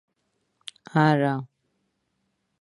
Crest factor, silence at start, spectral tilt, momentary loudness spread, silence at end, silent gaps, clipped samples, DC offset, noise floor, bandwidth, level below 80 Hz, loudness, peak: 22 dB; 0.95 s; -7.5 dB/octave; 23 LU; 1.15 s; none; under 0.1%; under 0.1%; -75 dBFS; 11.5 kHz; -72 dBFS; -23 LUFS; -6 dBFS